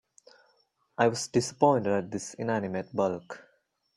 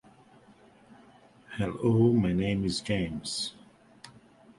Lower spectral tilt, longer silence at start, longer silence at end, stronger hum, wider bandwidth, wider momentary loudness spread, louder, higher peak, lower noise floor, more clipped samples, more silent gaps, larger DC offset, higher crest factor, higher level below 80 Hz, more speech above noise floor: about the same, -5 dB/octave vs -6 dB/octave; second, 1 s vs 1.5 s; about the same, 0.55 s vs 0.5 s; neither; about the same, 12.5 kHz vs 11.5 kHz; first, 16 LU vs 11 LU; about the same, -28 LUFS vs -28 LUFS; first, -8 dBFS vs -12 dBFS; first, -70 dBFS vs -57 dBFS; neither; neither; neither; about the same, 22 dB vs 18 dB; second, -68 dBFS vs -52 dBFS; first, 42 dB vs 30 dB